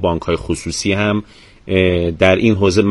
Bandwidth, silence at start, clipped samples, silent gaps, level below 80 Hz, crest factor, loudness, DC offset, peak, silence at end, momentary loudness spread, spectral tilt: 11.5 kHz; 0 s; under 0.1%; none; -36 dBFS; 16 dB; -16 LUFS; under 0.1%; 0 dBFS; 0 s; 7 LU; -5.5 dB/octave